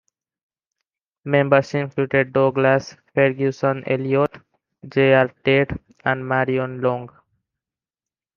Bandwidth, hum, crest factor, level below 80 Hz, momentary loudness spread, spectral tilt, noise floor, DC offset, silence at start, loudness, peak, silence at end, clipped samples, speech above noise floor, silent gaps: 7.2 kHz; none; 18 dB; -54 dBFS; 9 LU; -7.5 dB/octave; under -90 dBFS; under 0.1%; 1.25 s; -20 LUFS; -2 dBFS; 1.3 s; under 0.1%; over 71 dB; none